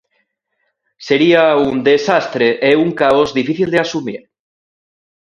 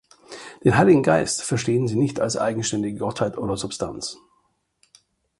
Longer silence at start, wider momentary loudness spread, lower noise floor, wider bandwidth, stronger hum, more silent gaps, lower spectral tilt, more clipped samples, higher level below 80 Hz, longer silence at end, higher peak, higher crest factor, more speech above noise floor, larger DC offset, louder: first, 1 s vs 0.3 s; second, 11 LU vs 16 LU; about the same, -69 dBFS vs -67 dBFS; second, 9 kHz vs 11.5 kHz; neither; neither; about the same, -5.5 dB/octave vs -5 dB/octave; neither; about the same, -54 dBFS vs -52 dBFS; second, 1.05 s vs 1.25 s; about the same, 0 dBFS vs -2 dBFS; about the same, 16 dB vs 20 dB; first, 55 dB vs 46 dB; neither; first, -13 LUFS vs -22 LUFS